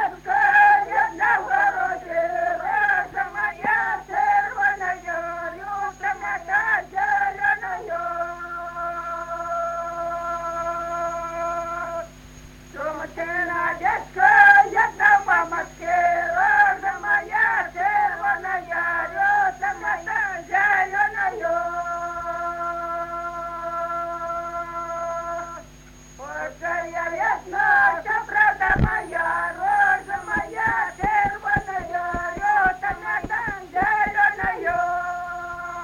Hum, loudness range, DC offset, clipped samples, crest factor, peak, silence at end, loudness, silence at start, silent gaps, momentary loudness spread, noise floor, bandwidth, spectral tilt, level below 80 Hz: none; 11 LU; under 0.1%; under 0.1%; 22 dB; 0 dBFS; 0 s; -22 LUFS; 0 s; none; 12 LU; -45 dBFS; 16 kHz; -4.5 dB/octave; -44 dBFS